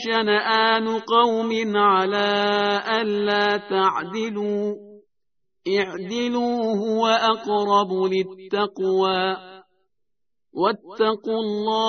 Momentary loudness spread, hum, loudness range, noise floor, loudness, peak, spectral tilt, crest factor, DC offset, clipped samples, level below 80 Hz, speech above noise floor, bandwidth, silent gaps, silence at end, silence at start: 8 LU; none; 5 LU; -83 dBFS; -21 LUFS; -4 dBFS; -2 dB/octave; 18 dB; under 0.1%; under 0.1%; -68 dBFS; 62 dB; 6.6 kHz; none; 0 s; 0 s